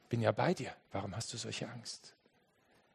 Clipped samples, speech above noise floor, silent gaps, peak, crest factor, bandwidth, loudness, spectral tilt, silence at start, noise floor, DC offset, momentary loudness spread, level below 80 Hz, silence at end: under 0.1%; 34 dB; none; -14 dBFS; 24 dB; 12.5 kHz; -38 LUFS; -5 dB/octave; 0.1 s; -72 dBFS; under 0.1%; 14 LU; -74 dBFS; 0.85 s